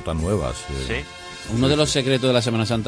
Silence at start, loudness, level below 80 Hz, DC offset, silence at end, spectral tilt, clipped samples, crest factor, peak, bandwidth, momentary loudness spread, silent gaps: 0 s; -21 LUFS; -36 dBFS; under 0.1%; 0 s; -5 dB/octave; under 0.1%; 16 dB; -6 dBFS; 11 kHz; 10 LU; none